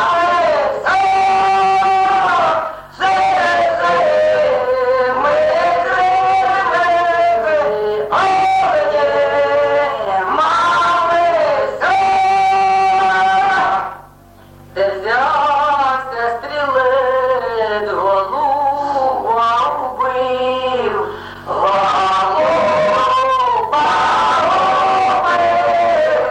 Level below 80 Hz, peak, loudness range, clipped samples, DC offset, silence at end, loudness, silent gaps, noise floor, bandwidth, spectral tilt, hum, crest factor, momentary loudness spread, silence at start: -48 dBFS; -4 dBFS; 3 LU; under 0.1%; under 0.1%; 0 s; -14 LUFS; none; -42 dBFS; 10 kHz; -3.5 dB/octave; none; 10 dB; 5 LU; 0 s